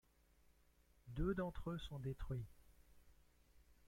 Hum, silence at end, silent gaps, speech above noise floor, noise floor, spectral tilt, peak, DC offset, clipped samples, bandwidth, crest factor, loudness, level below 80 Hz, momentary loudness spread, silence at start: 60 Hz at -65 dBFS; 0.15 s; none; 29 dB; -73 dBFS; -8 dB/octave; -28 dBFS; under 0.1%; under 0.1%; 16.5 kHz; 20 dB; -47 LUFS; -56 dBFS; 9 LU; 1.05 s